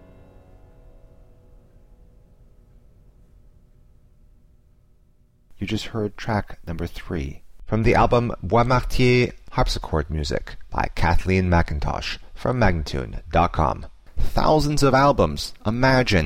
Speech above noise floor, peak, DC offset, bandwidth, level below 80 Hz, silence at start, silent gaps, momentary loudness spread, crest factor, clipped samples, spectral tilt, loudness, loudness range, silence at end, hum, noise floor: 37 dB; -6 dBFS; under 0.1%; 15.5 kHz; -32 dBFS; 5.55 s; none; 13 LU; 16 dB; under 0.1%; -6 dB/octave; -22 LUFS; 11 LU; 0 s; none; -57 dBFS